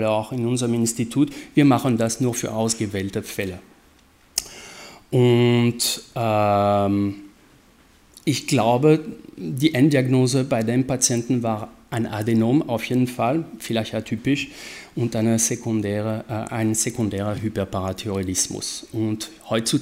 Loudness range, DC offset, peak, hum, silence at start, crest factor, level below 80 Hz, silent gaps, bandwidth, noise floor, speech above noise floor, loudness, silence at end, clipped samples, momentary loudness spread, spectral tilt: 4 LU; under 0.1%; -2 dBFS; none; 0 s; 20 dB; -54 dBFS; none; 16 kHz; -54 dBFS; 33 dB; -22 LUFS; 0 s; under 0.1%; 11 LU; -5 dB/octave